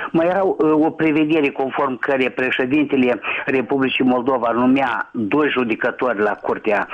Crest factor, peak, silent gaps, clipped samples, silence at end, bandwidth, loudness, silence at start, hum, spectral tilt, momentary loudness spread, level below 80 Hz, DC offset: 10 dB; -8 dBFS; none; under 0.1%; 0 s; 6.2 kHz; -18 LUFS; 0 s; none; -7.5 dB/octave; 4 LU; -58 dBFS; under 0.1%